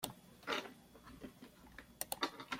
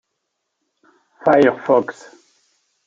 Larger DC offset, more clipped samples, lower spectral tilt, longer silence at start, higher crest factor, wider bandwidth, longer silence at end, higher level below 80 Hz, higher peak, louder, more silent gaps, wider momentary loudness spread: neither; neither; second, -2 dB/octave vs -6.5 dB/octave; second, 0 s vs 1.25 s; first, 28 dB vs 18 dB; first, 16.5 kHz vs 7.8 kHz; second, 0 s vs 0.95 s; second, -70 dBFS vs -64 dBFS; second, -18 dBFS vs -2 dBFS; second, -45 LUFS vs -16 LUFS; neither; first, 18 LU vs 9 LU